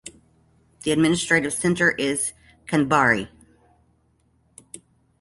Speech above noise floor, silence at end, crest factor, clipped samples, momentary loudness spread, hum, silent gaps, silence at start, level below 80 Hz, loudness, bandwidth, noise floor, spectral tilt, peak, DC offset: 43 dB; 0.45 s; 20 dB; under 0.1%; 24 LU; none; none; 0.05 s; -54 dBFS; -21 LUFS; 12 kHz; -64 dBFS; -4 dB/octave; -4 dBFS; under 0.1%